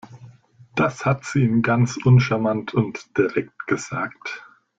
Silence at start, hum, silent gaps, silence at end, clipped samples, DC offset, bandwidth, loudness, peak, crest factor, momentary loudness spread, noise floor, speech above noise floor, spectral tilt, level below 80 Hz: 0.1 s; none; none; 0.4 s; under 0.1%; under 0.1%; 7.8 kHz; -21 LUFS; -4 dBFS; 18 dB; 13 LU; -49 dBFS; 29 dB; -7 dB/octave; -54 dBFS